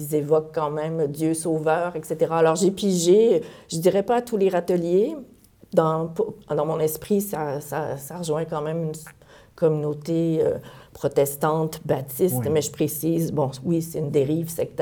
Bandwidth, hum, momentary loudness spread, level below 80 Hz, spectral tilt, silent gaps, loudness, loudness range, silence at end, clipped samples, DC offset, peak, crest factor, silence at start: over 20 kHz; none; 8 LU; -58 dBFS; -6 dB/octave; none; -23 LUFS; 6 LU; 0 s; under 0.1%; under 0.1%; -6 dBFS; 18 dB; 0 s